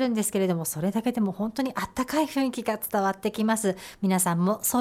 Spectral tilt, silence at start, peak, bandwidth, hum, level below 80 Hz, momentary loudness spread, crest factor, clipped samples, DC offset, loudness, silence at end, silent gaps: -5 dB/octave; 0 s; -12 dBFS; 16.5 kHz; none; -58 dBFS; 6 LU; 14 dB; under 0.1%; under 0.1%; -26 LUFS; 0 s; none